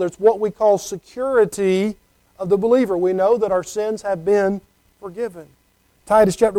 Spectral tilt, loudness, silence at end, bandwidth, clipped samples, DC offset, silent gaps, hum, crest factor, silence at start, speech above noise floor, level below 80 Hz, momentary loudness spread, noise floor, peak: -6 dB/octave; -19 LUFS; 0 s; 15.5 kHz; under 0.1%; under 0.1%; none; none; 16 dB; 0 s; 42 dB; -52 dBFS; 13 LU; -60 dBFS; -4 dBFS